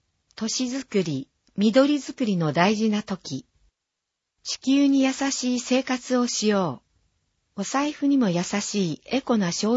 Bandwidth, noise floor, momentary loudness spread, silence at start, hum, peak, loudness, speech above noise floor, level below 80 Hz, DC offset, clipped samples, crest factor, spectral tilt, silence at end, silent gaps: 8 kHz; -83 dBFS; 12 LU; 0.4 s; none; -4 dBFS; -24 LUFS; 60 dB; -66 dBFS; under 0.1%; under 0.1%; 20 dB; -4.5 dB/octave; 0 s; none